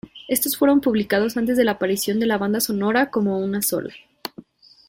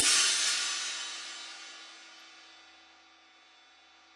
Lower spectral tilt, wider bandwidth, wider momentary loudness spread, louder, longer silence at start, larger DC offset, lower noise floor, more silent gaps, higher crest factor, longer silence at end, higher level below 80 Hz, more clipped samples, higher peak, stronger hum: first, -4 dB/octave vs 3.5 dB/octave; first, 17 kHz vs 12 kHz; second, 16 LU vs 27 LU; first, -20 LUFS vs -28 LUFS; about the same, 0.05 s vs 0 s; neither; second, -45 dBFS vs -60 dBFS; neither; second, 16 dB vs 24 dB; second, 0.45 s vs 1.55 s; first, -56 dBFS vs -86 dBFS; neither; first, -6 dBFS vs -10 dBFS; neither